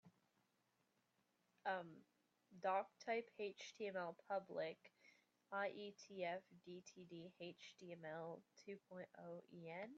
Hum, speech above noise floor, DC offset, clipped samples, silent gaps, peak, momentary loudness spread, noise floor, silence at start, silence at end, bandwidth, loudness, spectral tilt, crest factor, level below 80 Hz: none; 35 dB; under 0.1%; under 0.1%; none; -30 dBFS; 13 LU; -85 dBFS; 0.05 s; 0 s; 7.4 kHz; -51 LUFS; -3 dB/octave; 20 dB; under -90 dBFS